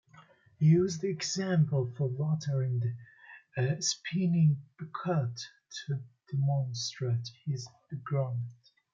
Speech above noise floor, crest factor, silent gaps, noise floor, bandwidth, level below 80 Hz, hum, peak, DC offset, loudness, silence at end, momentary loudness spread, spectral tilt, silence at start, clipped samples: 29 dB; 16 dB; none; -59 dBFS; 7.6 kHz; -74 dBFS; none; -16 dBFS; under 0.1%; -31 LUFS; 0.4 s; 16 LU; -6 dB/octave; 0.15 s; under 0.1%